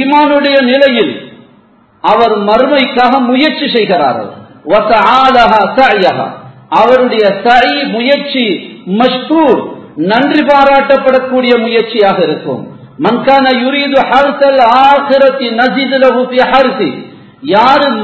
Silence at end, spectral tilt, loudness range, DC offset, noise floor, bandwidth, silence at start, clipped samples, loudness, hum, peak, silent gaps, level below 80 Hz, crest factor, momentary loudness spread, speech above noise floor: 0 s; -6 dB/octave; 2 LU; under 0.1%; -44 dBFS; 8 kHz; 0 s; 0.8%; -8 LUFS; none; 0 dBFS; none; -46 dBFS; 8 dB; 10 LU; 36 dB